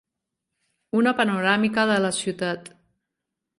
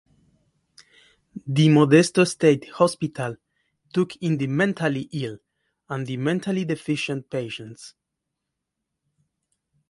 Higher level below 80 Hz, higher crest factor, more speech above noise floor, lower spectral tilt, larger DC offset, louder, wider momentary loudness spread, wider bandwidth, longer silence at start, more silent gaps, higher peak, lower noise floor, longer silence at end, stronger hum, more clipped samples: about the same, -66 dBFS vs -66 dBFS; about the same, 18 dB vs 22 dB; about the same, 61 dB vs 60 dB; second, -4.5 dB/octave vs -6 dB/octave; neither; about the same, -22 LUFS vs -22 LUFS; second, 8 LU vs 17 LU; about the same, 11.5 kHz vs 11.5 kHz; second, 0.95 s vs 1.35 s; neither; second, -6 dBFS vs -2 dBFS; about the same, -83 dBFS vs -82 dBFS; second, 0.9 s vs 2 s; neither; neither